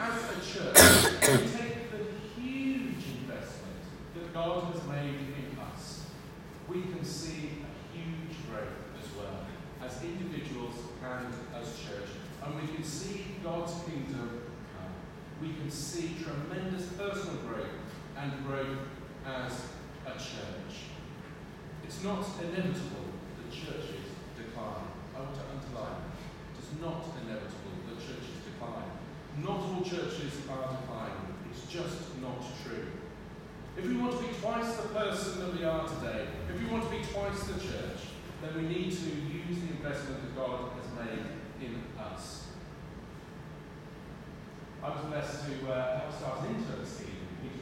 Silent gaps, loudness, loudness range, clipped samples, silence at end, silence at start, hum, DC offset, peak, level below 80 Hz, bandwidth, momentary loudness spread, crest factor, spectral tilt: none; -34 LUFS; 7 LU; under 0.1%; 0 s; 0 s; none; under 0.1%; -2 dBFS; -54 dBFS; 16 kHz; 11 LU; 34 dB; -3.5 dB/octave